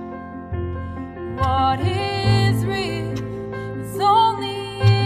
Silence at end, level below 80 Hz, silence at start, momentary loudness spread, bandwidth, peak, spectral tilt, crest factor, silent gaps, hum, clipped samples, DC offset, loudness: 0 s; -40 dBFS; 0 s; 14 LU; 14 kHz; -4 dBFS; -6.5 dB/octave; 16 dB; none; none; under 0.1%; under 0.1%; -21 LUFS